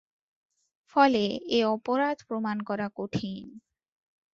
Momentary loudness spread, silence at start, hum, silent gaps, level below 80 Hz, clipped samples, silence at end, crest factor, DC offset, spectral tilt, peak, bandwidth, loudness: 11 LU; 0.95 s; none; none; -66 dBFS; under 0.1%; 0.75 s; 22 dB; under 0.1%; -6 dB/octave; -6 dBFS; 7.6 kHz; -28 LUFS